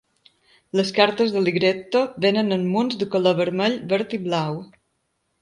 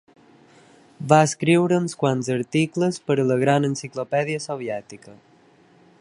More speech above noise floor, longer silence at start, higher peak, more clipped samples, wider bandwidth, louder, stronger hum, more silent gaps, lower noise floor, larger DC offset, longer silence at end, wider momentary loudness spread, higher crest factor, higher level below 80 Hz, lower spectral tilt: first, 51 dB vs 33 dB; second, 0.75 s vs 1 s; about the same, -2 dBFS vs 0 dBFS; neither; about the same, 11.5 kHz vs 11.5 kHz; about the same, -21 LUFS vs -21 LUFS; neither; neither; first, -72 dBFS vs -55 dBFS; neither; about the same, 0.75 s vs 0.85 s; second, 6 LU vs 12 LU; about the same, 20 dB vs 22 dB; about the same, -66 dBFS vs -66 dBFS; about the same, -6 dB/octave vs -6 dB/octave